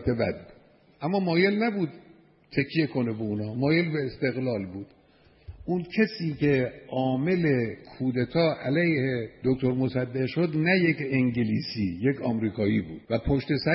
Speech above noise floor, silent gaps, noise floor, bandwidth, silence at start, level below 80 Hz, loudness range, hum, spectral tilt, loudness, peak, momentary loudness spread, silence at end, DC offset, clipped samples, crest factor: 33 dB; none; -59 dBFS; 5.8 kHz; 0 s; -50 dBFS; 3 LU; none; -11 dB/octave; -27 LUFS; -10 dBFS; 8 LU; 0 s; under 0.1%; under 0.1%; 18 dB